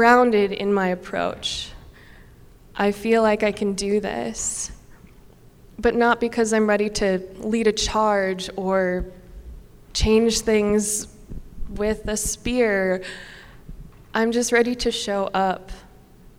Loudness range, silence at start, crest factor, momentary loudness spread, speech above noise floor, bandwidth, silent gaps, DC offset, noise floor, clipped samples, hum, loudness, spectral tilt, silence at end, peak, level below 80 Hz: 3 LU; 0 s; 20 dB; 13 LU; 27 dB; 16.5 kHz; none; under 0.1%; -48 dBFS; under 0.1%; none; -22 LUFS; -4 dB/octave; 0.1 s; -2 dBFS; -40 dBFS